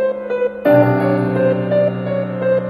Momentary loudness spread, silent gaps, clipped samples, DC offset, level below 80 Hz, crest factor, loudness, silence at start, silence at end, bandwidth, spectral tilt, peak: 8 LU; none; under 0.1%; under 0.1%; -54 dBFS; 14 dB; -16 LUFS; 0 s; 0 s; 13.5 kHz; -10 dB/octave; 0 dBFS